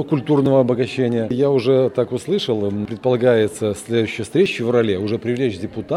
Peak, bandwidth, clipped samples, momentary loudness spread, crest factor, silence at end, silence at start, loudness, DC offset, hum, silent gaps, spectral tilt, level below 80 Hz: -2 dBFS; 12.5 kHz; under 0.1%; 6 LU; 16 dB; 0 s; 0 s; -19 LUFS; under 0.1%; none; none; -6.5 dB/octave; -56 dBFS